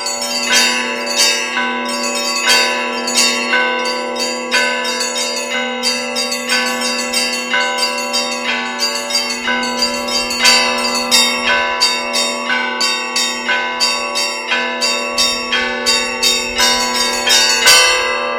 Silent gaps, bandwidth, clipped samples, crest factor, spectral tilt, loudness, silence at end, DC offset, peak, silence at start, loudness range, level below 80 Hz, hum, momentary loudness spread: none; 16.5 kHz; under 0.1%; 16 dB; 0.5 dB/octave; -13 LUFS; 0 s; under 0.1%; 0 dBFS; 0 s; 3 LU; -50 dBFS; none; 7 LU